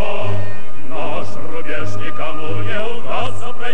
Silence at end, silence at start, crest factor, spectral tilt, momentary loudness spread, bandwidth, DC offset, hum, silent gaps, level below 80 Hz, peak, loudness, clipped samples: 0 s; 0 s; 16 dB; -6 dB/octave; 6 LU; 15 kHz; 50%; none; none; -54 dBFS; -2 dBFS; -26 LUFS; under 0.1%